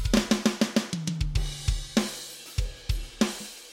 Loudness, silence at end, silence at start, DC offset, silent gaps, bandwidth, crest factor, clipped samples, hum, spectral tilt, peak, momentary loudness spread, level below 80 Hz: -29 LUFS; 0 s; 0 s; under 0.1%; none; 16.5 kHz; 20 dB; under 0.1%; none; -4.5 dB/octave; -8 dBFS; 9 LU; -34 dBFS